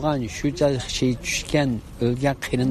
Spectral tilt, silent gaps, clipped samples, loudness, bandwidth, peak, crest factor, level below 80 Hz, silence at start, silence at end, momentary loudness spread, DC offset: -5 dB/octave; none; under 0.1%; -23 LUFS; 14 kHz; -6 dBFS; 16 dB; -40 dBFS; 0 s; 0 s; 4 LU; under 0.1%